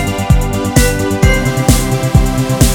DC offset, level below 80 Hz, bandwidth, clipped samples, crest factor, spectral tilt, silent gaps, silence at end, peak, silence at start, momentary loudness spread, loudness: under 0.1%; -16 dBFS; 19.5 kHz; 0.4%; 12 dB; -5 dB/octave; none; 0 s; 0 dBFS; 0 s; 2 LU; -12 LUFS